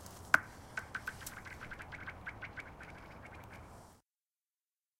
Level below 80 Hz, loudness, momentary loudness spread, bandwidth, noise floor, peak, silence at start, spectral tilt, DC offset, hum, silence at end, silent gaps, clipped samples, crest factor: -62 dBFS; -40 LUFS; 20 LU; 16.5 kHz; under -90 dBFS; -8 dBFS; 0 s; -3 dB/octave; under 0.1%; none; 1 s; none; under 0.1%; 36 dB